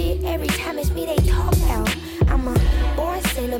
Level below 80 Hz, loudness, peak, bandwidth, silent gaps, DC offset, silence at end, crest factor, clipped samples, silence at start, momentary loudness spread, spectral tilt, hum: -22 dBFS; -21 LUFS; -8 dBFS; 17.5 kHz; none; under 0.1%; 0 s; 10 dB; under 0.1%; 0 s; 4 LU; -5.5 dB/octave; none